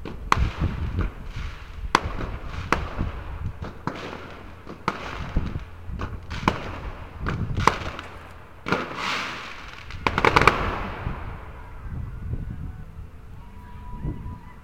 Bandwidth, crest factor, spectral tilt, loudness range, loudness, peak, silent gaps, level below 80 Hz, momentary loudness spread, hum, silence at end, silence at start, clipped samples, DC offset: 16.5 kHz; 28 dB; -5 dB/octave; 9 LU; -28 LUFS; 0 dBFS; none; -36 dBFS; 18 LU; none; 0 s; 0 s; under 0.1%; 0.4%